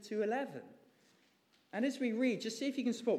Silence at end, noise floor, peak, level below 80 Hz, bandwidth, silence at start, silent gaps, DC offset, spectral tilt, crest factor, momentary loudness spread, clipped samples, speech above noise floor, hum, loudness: 0 s; -72 dBFS; -22 dBFS; under -90 dBFS; 13.5 kHz; 0 s; none; under 0.1%; -4.5 dB/octave; 16 dB; 11 LU; under 0.1%; 36 dB; none; -37 LUFS